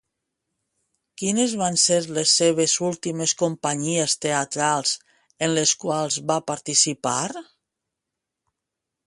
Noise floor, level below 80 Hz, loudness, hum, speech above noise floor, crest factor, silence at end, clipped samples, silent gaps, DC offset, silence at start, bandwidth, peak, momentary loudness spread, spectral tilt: -84 dBFS; -68 dBFS; -21 LUFS; none; 62 dB; 20 dB; 1.65 s; under 0.1%; none; under 0.1%; 1.2 s; 11.5 kHz; -6 dBFS; 8 LU; -2.5 dB/octave